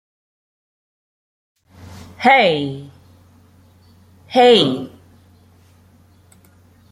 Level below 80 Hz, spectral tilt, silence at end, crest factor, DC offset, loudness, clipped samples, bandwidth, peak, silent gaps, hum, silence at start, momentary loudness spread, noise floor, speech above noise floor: -62 dBFS; -5 dB/octave; 2.05 s; 20 dB; under 0.1%; -14 LUFS; under 0.1%; 12 kHz; -2 dBFS; none; none; 1.9 s; 23 LU; -51 dBFS; 37 dB